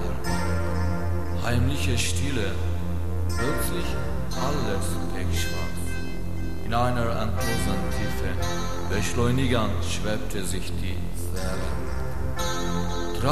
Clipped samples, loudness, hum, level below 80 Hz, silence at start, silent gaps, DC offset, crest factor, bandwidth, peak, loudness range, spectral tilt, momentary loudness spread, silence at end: under 0.1%; -28 LUFS; none; -34 dBFS; 0 s; none; 5%; 18 dB; 14 kHz; -8 dBFS; 3 LU; -5 dB/octave; 7 LU; 0 s